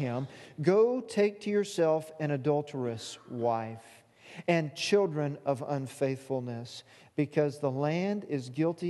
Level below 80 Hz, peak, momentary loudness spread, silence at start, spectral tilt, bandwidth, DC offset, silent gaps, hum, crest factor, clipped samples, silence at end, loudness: -76 dBFS; -12 dBFS; 13 LU; 0 s; -6 dB/octave; 12.5 kHz; under 0.1%; none; none; 18 dB; under 0.1%; 0 s; -31 LUFS